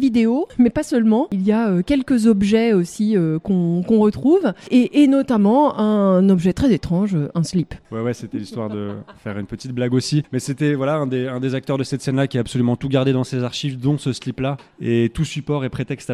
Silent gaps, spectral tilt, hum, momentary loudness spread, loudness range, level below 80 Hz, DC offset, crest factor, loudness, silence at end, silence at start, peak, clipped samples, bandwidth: none; -7 dB/octave; none; 11 LU; 7 LU; -46 dBFS; under 0.1%; 16 dB; -19 LUFS; 0 s; 0 s; -4 dBFS; under 0.1%; 12.5 kHz